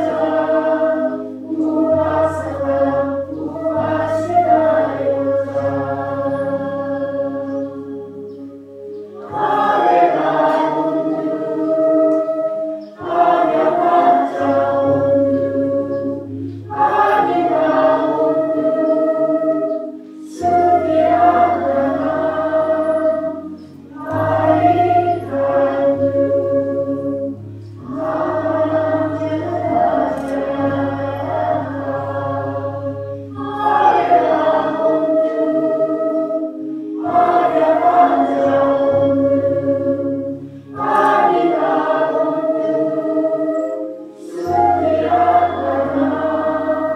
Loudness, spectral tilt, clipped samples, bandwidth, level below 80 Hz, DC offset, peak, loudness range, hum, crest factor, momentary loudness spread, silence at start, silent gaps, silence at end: -17 LUFS; -8 dB/octave; under 0.1%; 8.8 kHz; -56 dBFS; under 0.1%; -2 dBFS; 4 LU; none; 14 dB; 12 LU; 0 s; none; 0 s